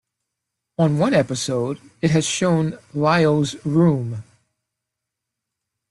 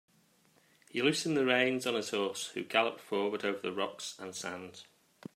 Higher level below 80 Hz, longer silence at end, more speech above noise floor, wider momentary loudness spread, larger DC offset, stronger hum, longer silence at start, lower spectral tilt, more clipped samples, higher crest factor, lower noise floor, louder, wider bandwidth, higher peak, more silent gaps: first, -56 dBFS vs -82 dBFS; first, 1.7 s vs 0.55 s; first, 63 dB vs 35 dB; second, 9 LU vs 13 LU; neither; neither; second, 0.8 s vs 0.95 s; first, -5.5 dB/octave vs -3.5 dB/octave; neither; second, 16 dB vs 22 dB; first, -82 dBFS vs -68 dBFS; first, -20 LUFS vs -33 LUFS; second, 12 kHz vs 15.5 kHz; first, -4 dBFS vs -12 dBFS; neither